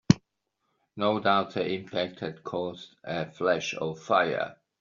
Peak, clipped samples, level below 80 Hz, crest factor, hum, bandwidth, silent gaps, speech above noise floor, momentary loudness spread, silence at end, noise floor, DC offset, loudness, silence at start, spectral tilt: -4 dBFS; under 0.1%; -62 dBFS; 26 dB; none; 7.4 kHz; none; 50 dB; 12 LU; 0.25 s; -79 dBFS; under 0.1%; -29 LUFS; 0.1 s; -4.5 dB/octave